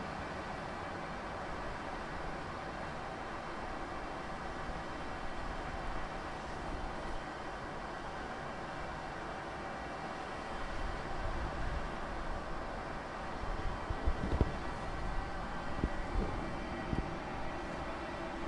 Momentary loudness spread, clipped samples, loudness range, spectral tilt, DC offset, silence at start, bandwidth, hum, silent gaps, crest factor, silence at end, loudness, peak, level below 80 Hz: 4 LU; under 0.1%; 3 LU; -6 dB/octave; under 0.1%; 0 s; 11.5 kHz; none; none; 22 dB; 0 s; -41 LUFS; -16 dBFS; -44 dBFS